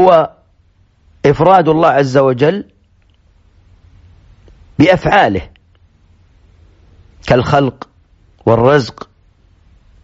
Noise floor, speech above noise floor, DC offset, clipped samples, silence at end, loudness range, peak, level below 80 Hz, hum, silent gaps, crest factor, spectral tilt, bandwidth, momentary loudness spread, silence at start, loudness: -52 dBFS; 41 dB; under 0.1%; under 0.1%; 1.15 s; 3 LU; 0 dBFS; -40 dBFS; none; none; 14 dB; -5 dB/octave; 8 kHz; 16 LU; 0 s; -12 LUFS